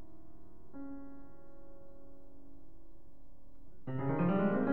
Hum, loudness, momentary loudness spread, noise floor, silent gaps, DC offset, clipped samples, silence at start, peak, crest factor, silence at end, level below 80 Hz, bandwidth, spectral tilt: none; -36 LUFS; 29 LU; -59 dBFS; none; 0.9%; under 0.1%; 0 s; -20 dBFS; 18 dB; 0 s; -60 dBFS; 3.9 kHz; -11 dB/octave